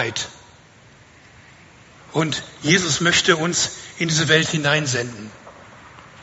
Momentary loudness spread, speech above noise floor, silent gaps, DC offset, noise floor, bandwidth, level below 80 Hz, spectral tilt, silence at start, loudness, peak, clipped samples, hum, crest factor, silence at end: 13 LU; 29 dB; none; under 0.1%; -49 dBFS; 8.2 kHz; -54 dBFS; -3 dB/octave; 0 s; -19 LUFS; 0 dBFS; under 0.1%; none; 22 dB; 0 s